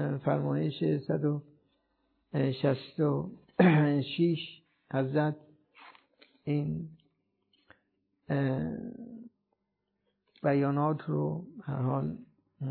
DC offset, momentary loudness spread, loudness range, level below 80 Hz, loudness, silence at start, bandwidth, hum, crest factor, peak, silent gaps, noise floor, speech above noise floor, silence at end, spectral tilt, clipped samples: under 0.1%; 15 LU; 9 LU; -68 dBFS; -31 LUFS; 0 s; 4.5 kHz; none; 20 dB; -12 dBFS; none; -82 dBFS; 52 dB; 0 s; -11 dB/octave; under 0.1%